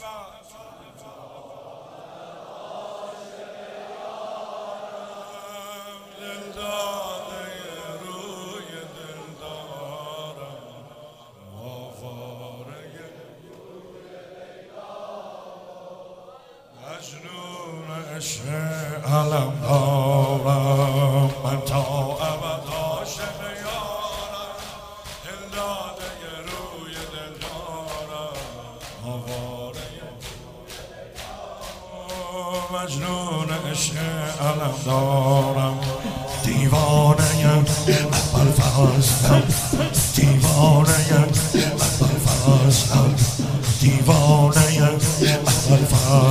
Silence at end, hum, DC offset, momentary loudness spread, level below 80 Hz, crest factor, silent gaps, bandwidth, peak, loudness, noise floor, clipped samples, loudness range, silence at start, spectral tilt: 0 s; none; under 0.1%; 23 LU; -40 dBFS; 22 dB; none; 16 kHz; -2 dBFS; -20 LUFS; -47 dBFS; under 0.1%; 23 LU; 0 s; -5 dB/octave